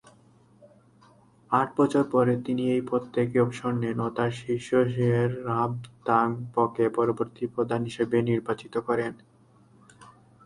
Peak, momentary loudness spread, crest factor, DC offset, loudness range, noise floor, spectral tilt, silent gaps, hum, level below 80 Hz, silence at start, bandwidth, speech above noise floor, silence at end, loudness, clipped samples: -8 dBFS; 7 LU; 20 dB; under 0.1%; 2 LU; -58 dBFS; -7.5 dB/octave; none; none; -64 dBFS; 1.5 s; 11.5 kHz; 32 dB; 0.4 s; -26 LUFS; under 0.1%